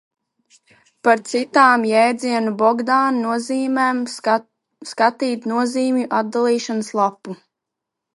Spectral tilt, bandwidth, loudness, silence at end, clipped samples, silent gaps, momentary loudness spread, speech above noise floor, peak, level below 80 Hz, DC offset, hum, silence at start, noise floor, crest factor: -4 dB/octave; 11.5 kHz; -18 LUFS; 0.8 s; under 0.1%; none; 9 LU; 64 dB; 0 dBFS; -76 dBFS; under 0.1%; none; 1.05 s; -82 dBFS; 18 dB